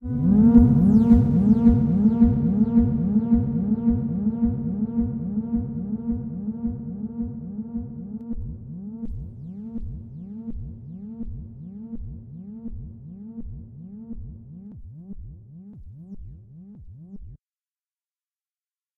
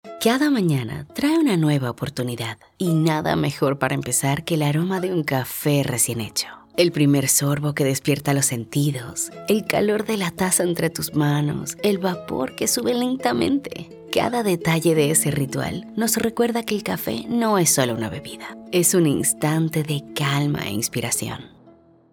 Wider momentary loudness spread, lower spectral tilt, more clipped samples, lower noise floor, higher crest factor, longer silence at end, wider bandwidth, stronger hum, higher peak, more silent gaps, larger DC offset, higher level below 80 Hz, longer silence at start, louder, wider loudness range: first, 25 LU vs 9 LU; first, -12.5 dB/octave vs -4.5 dB/octave; neither; first, under -90 dBFS vs -51 dBFS; about the same, 20 dB vs 18 dB; first, 1.6 s vs 0.45 s; second, 2.2 kHz vs 19 kHz; neither; about the same, -2 dBFS vs -4 dBFS; neither; neither; first, -36 dBFS vs -54 dBFS; about the same, 0 s vs 0.05 s; about the same, -21 LUFS vs -21 LUFS; first, 23 LU vs 2 LU